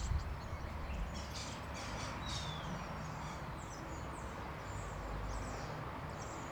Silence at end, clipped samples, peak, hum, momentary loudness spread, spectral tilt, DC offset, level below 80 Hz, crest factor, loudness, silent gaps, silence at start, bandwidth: 0 s; under 0.1%; -26 dBFS; none; 4 LU; -4.5 dB/octave; under 0.1%; -48 dBFS; 18 dB; -44 LUFS; none; 0 s; over 20 kHz